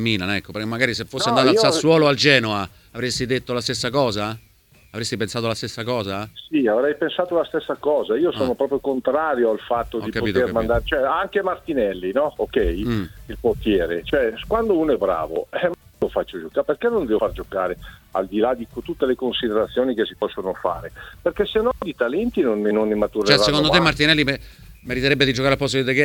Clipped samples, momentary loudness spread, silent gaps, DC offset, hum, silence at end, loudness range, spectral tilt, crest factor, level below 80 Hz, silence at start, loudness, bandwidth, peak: under 0.1%; 11 LU; none; under 0.1%; none; 0 s; 5 LU; -5 dB/octave; 20 dB; -42 dBFS; 0 s; -21 LUFS; 19 kHz; 0 dBFS